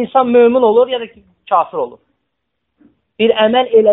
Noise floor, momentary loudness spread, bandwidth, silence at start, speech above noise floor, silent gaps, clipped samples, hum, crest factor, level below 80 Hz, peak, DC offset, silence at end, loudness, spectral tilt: -73 dBFS; 13 LU; 4 kHz; 0 s; 61 dB; none; under 0.1%; none; 14 dB; -60 dBFS; 0 dBFS; under 0.1%; 0 s; -13 LUFS; -10 dB/octave